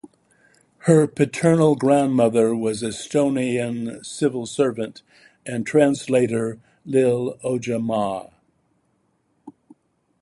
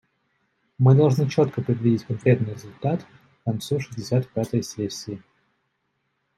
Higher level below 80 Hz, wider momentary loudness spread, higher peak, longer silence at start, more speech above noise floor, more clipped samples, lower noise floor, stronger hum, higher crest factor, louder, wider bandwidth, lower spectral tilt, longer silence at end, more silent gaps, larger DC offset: about the same, -62 dBFS vs -64 dBFS; about the same, 12 LU vs 13 LU; about the same, -2 dBFS vs -4 dBFS; second, 0.05 s vs 0.8 s; second, 47 dB vs 52 dB; neither; second, -67 dBFS vs -74 dBFS; neither; about the same, 20 dB vs 20 dB; about the same, -21 LUFS vs -23 LUFS; second, 11.5 kHz vs 13 kHz; about the same, -6.5 dB/octave vs -7.5 dB/octave; second, 0.7 s vs 1.2 s; neither; neither